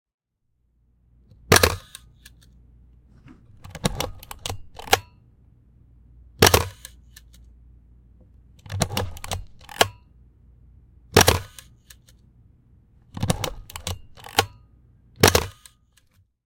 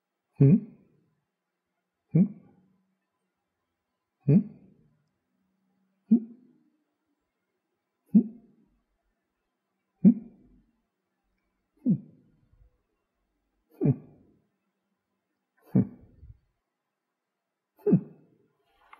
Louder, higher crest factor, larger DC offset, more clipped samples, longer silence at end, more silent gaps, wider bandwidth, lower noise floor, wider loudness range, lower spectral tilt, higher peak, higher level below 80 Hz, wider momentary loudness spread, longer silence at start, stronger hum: first, -22 LUFS vs -26 LUFS; about the same, 26 dB vs 22 dB; neither; neither; about the same, 0.95 s vs 1 s; neither; first, 17 kHz vs 2.7 kHz; second, -71 dBFS vs -85 dBFS; about the same, 6 LU vs 7 LU; second, -3 dB/octave vs -14 dB/octave; first, 0 dBFS vs -8 dBFS; first, -42 dBFS vs -68 dBFS; first, 23 LU vs 12 LU; first, 1.5 s vs 0.4 s; neither